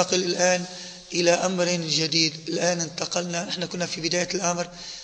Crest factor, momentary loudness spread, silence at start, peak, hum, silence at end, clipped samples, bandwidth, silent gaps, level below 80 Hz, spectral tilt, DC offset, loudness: 20 dB; 8 LU; 0 s; -6 dBFS; none; 0 s; under 0.1%; 9.6 kHz; none; -62 dBFS; -3 dB/octave; under 0.1%; -24 LUFS